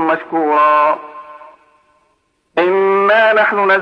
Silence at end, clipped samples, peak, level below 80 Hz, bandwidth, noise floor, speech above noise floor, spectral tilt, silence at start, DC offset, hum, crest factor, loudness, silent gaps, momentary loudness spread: 0 s; under 0.1%; -2 dBFS; -68 dBFS; 6.2 kHz; -62 dBFS; 49 dB; -6 dB/octave; 0 s; under 0.1%; none; 12 dB; -13 LUFS; none; 12 LU